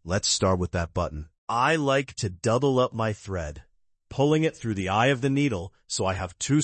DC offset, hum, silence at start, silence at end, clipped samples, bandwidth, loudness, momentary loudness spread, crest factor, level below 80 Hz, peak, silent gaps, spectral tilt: under 0.1%; none; 0.05 s; 0 s; under 0.1%; 8.8 kHz; -25 LUFS; 10 LU; 16 dB; -50 dBFS; -10 dBFS; 1.38-1.47 s; -5 dB/octave